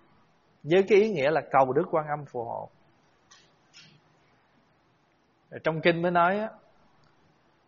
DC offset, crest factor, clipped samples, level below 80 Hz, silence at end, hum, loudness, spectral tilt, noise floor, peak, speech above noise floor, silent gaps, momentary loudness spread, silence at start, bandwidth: under 0.1%; 22 dB; under 0.1%; -70 dBFS; 1.15 s; none; -25 LUFS; -4.5 dB/octave; -67 dBFS; -8 dBFS; 42 dB; none; 17 LU; 0.65 s; 7 kHz